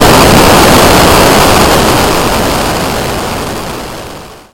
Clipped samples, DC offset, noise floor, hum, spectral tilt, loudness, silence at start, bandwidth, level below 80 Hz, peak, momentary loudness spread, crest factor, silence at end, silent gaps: 2%; under 0.1%; -27 dBFS; none; -4 dB/octave; -6 LUFS; 0 s; over 20 kHz; -20 dBFS; 0 dBFS; 16 LU; 6 dB; 0.15 s; none